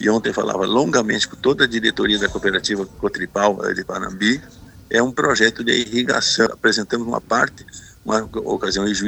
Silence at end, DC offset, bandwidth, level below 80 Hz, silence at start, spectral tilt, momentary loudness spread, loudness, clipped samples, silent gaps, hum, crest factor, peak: 0 s; under 0.1%; 19 kHz; -46 dBFS; 0 s; -3 dB/octave; 7 LU; -19 LUFS; under 0.1%; none; none; 20 dB; 0 dBFS